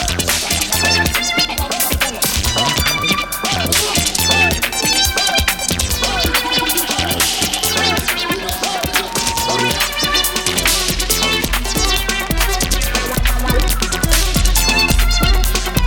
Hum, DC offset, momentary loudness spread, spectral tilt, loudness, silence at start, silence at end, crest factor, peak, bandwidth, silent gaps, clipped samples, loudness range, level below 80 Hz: none; under 0.1%; 4 LU; -2 dB/octave; -15 LUFS; 0 s; 0 s; 16 dB; 0 dBFS; 19.5 kHz; none; under 0.1%; 2 LU; -22 dBFS